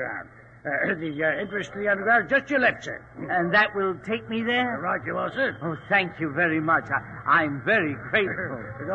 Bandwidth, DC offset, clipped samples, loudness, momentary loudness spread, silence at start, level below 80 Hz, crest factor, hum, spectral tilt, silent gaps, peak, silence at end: 8.6 kHz; under 0.1%; under 0.1%; -24 LUFS; 11 LU; 0 s; -58 dBFS; 18 dB; none; -6 dB/octave; none; -6 dBFS; 0 s